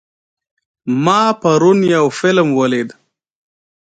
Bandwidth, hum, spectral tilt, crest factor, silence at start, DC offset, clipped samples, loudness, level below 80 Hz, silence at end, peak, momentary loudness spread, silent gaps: 9.2 kHz; none; -6 dB/octave; 16 dB; 0.85 s; under 0.1%; under 0.1%; -13 LUFS; -60 dBFS; 1.05 s; 0 dBFS; 9 LU; none